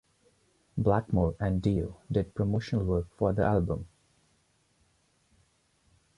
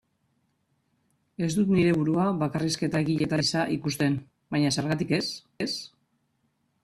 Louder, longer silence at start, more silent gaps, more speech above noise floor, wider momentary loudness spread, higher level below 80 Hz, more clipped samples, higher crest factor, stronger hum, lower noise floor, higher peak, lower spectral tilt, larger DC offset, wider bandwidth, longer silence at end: second, -30 LUFS vs -26 LUFS; second, 0.75 s vs 1.4 s; neither; second, 42 dB vs 47 dB; second, 7 LU vs 10 LU; first, -44 dBFS vs -60 dBFS; neither; about the same, 20 dB vs 16 dB; neither; about the same, -70 dBFS vs -73 dBFS; about the same, -12 dBFS vs -12 dBFS; first, -9 dB/octave vs -5.5 dB/octave; neither; second, 10.5 kHz vs 14 kHz; first, 2.3 s vs 0.95 s